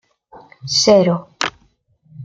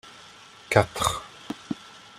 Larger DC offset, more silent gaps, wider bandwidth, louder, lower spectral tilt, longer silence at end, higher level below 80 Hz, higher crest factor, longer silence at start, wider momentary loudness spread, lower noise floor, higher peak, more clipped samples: neither; neither; second, 9.4 kHz vs 16 kHz; first, -16 LUFS vs -26 LUFS; about the same, -4 dB/octave vs -4 dB/octave; second, 0 s vs 0.3 s; about the same, -56 dBFS vs -52 dBFS; second, 18 dB vs 26 dB; first, 0.35 s vs 0.05 s; second, 12 LU vs 23 LU; first, -58 dBFS vs -49 dBFS; about the same, 0 dBFS vs -2 dBFS; neither